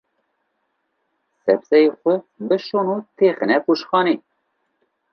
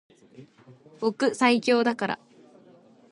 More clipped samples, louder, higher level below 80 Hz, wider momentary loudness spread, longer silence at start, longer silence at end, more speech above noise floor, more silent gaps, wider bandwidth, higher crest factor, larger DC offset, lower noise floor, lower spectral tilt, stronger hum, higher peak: neither; first, -19 LUFS vs -24 LUFS; about the same, -76 dBFS vs -76 dBFS; about the same, 8 LU vs 10 LU; first, 1.45 s vs 0.4 s; about the same, 0.95 s vs 0.95 s; first, 54 dB vs 29 dB; neither; second, 6.2 kHz vs 11 kHz; about the same, 18 dB vs 22 dB; neither; first, -72 dBFS vs -55 dBFS; first, -7 dB/octave vs -4 dB/octave; neither; first, -2 dBFS vs -6 dBFS